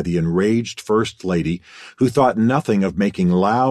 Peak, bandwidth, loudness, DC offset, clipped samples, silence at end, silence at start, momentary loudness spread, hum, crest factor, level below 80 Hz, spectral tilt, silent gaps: -2 dBFS; 13 kHz; -19 LUFS; under 0.1%; under 0.1%; 0 s; 0 s; 6 LU; none; 16 dB; -44 dBFS; -7 dB/octave; none